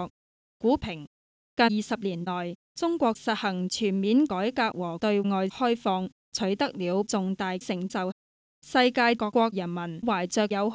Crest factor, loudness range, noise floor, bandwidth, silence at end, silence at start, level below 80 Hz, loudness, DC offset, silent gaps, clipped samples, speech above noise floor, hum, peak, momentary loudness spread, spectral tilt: 18 dB; 2 LU; under -90 dBFS; 8 kHz; 0 s; 0 s; -60 dBFS; -27 LUFS; under 0.1%; 0.10-0.60 s, 1.07-1.57 s, 2.55-2.75 s, 6.12-6.32 s, 8.12-8.62 s; under 0.1%; over 63 dB; none; -10 dBFS; 9 LU; -5 dB/octave